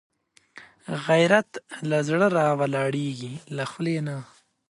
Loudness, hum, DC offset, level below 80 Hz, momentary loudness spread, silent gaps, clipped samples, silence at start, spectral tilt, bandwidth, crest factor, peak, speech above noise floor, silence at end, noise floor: -24 LUFS; none; under 0.1%; -70 dBFS; 15 LU; none; under 0.1%; 0.55 s; -6 dB/octave; 11.5 kHz; 20 dB; -4 dBFS; 28 dB; 0.45 s; -52 dBFS